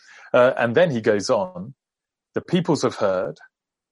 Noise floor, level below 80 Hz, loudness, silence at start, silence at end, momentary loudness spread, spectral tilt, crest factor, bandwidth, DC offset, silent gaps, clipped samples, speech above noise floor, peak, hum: -87 dBFS; -66 dBFS; -21 LUFS; 0.35 s; 0.6 s; 14 LU; -5.5 dB/octave; 18 dB; 11.5 kHz; under 0.1%; none; under 0.1%; 67 dB; -4 dBFS; none